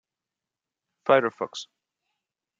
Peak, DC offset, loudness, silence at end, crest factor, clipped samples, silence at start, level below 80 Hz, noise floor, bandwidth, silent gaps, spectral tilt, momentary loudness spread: -6 dBFS; under 0.1%; -25 LUFS; 0.95 s; 24 dB; under 0.1%; 1.05 s; -80 dBFS; -89 dBFS; 7.6 kHz; none; -4.5 dB/octave; 18 LU